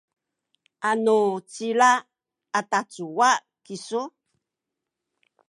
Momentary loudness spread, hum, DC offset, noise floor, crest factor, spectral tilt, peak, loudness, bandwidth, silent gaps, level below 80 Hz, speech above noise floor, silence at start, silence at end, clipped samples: 13 LU; none; under 0.1%; -85 dBFS; 20 dB; -3 dB/octave; -6 dBFS; -23 LUFS; 11.5 kHz; none; -84 dBFS; 63 dB; 0.8 s; 1.4 s; under 0.1%